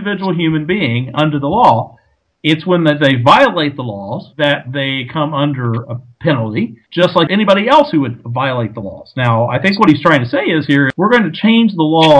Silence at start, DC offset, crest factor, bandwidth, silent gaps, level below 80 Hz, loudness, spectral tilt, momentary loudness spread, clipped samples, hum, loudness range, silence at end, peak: 0 s; under 0.1%; 12 dB; 11 kHz; none; -50 dBFS; -13 LUFS; -7 dB/octave; 11 LU; 0.4%; none; 3 LU; 0 s; 0 dBFS